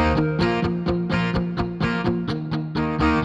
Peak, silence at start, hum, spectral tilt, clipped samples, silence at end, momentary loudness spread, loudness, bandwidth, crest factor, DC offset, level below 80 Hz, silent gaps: -8 dBFS; 0 s; none; -7.5 dB/octave; under 0.1%; 0 s; 5 LU; -23 LUFS; 7.8 kHz; 14 dB; under 0.1%; -36 dBFS; none